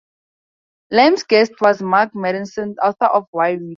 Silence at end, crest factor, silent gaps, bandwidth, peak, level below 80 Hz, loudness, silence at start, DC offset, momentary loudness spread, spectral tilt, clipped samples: 0 s; 16 dB; 3.27-3.33 s; 7.4 kHz; -2 dBFS; -64 dBFS; -16 LUFS; 0.9 s; under 0.1%; 9 LU; -5 dB/octave; under 0.1%